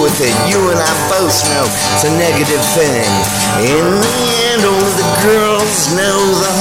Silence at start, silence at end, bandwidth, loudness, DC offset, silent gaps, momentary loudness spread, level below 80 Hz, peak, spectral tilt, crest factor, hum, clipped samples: 0 s; 0 s; 16.5 kHz; -11 LUFS; 0.3%; none; 1 LU; -40 dBFS; 0 dBFS; -3 dB/octave; 12 dB; none; under 0.1%